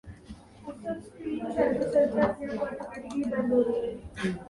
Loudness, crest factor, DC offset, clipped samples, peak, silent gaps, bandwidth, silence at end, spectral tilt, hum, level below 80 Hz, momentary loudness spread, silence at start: -29 LUFS; 16 dB; under 0.1%; under 0.1%; -12 dBFS; none; 11.5 kHz; 0 s; -7 dB/octave; none; -54 dBFS; 19 LU; 0.05 s